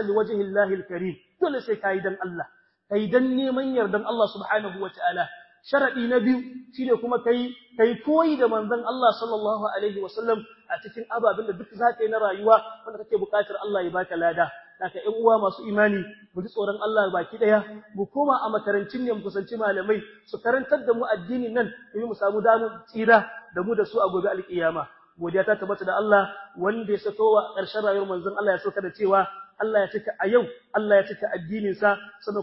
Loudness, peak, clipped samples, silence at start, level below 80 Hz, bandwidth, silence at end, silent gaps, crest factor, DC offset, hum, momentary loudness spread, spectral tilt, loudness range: -25 LUFS; -4 dBFS; under 0.1%; 0 s; -68 dBFS; 5.8 kHz; 0 s; none; 20 dB; under 0.1%; none; 11 LU; -10 dB/octave; 2 LU